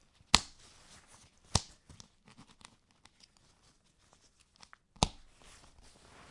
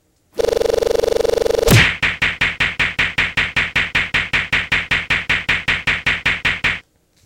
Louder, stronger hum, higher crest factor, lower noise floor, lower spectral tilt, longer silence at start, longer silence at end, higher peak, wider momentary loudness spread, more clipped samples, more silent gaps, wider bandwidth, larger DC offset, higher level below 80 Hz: second, -32 LUFS vs -16 LUFS; neither; first, 40 dB vs 18 dB; first, -68 dBFS vs -39 dBFS; second, -2 dB/octave vs -3.5 dB/octave; about the same, 0.35 s vs 0.35 s; first, 1.2 s vs 0.45 s; about the same, 0 dBFS vs 0 dBFS; first, 30 LU vs 4 LU; neither; neither; second, 11.5 kHz vs 17 kHz; neither; second, -52 dBFS vs -34 dBFS